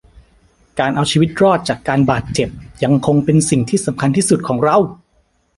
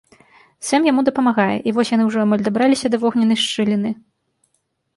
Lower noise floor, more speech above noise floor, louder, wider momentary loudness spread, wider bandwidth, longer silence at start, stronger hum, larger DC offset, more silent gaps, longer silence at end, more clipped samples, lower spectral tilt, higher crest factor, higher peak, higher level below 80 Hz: second, -59 dBFS vs -69 dBFS; second, 45 dB vs 52 dB; about the same, -15 LUFS vs -17 LUFS; about the same, 7 LU vs 5 LU; about the same, 11.5 kHz vs 11.5 kHz; first, 0.75 s vs 0.6 s; neither; neither; neither; second, 0.65 s vs 1 s; neither; about the same, -5.5 dB/octave vs -5 dB/octave; about the same, 14 dB vs 16 dB; about the same, -2 dBFS vs -2 dBFS; first, -44 dBFS vs -62 dBFS